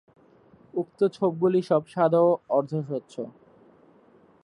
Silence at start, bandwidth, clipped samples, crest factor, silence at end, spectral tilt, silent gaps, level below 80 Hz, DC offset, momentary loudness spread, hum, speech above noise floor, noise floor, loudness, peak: 0.75 s; 11 kHz; under 0.1%; 18 dB; 1.15 s; -8.5 dB/octave; none; -74 dBFS; under 0.1%; 14 LU; none; 33 dB; -57 dBFS; -25 LUFS; -8 dBFS